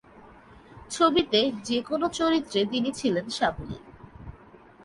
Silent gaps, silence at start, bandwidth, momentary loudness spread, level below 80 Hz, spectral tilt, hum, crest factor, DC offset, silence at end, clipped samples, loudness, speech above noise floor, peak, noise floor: none; 0.15 s; 11.5 kHz; 21 LU; -52 dBFS; -4 dB/octave; none; 20 dB; under 0.1%; 0 s; under 0.1%; -25 LUFS; 26 dB; -8 dBFS; -51 dBFS